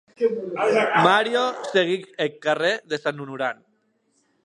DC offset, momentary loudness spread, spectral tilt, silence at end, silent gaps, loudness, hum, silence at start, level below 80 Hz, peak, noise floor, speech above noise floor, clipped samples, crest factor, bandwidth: under 0.1%; 11 LU; -4.5 dB/octave; 0.9 s; none; -22 LUFS; none; 0.2 s; -76 dBFS; -2 dBFS; -67 dBFS; 45 dB; under 0.1%; 20 dB; 10.5 kHz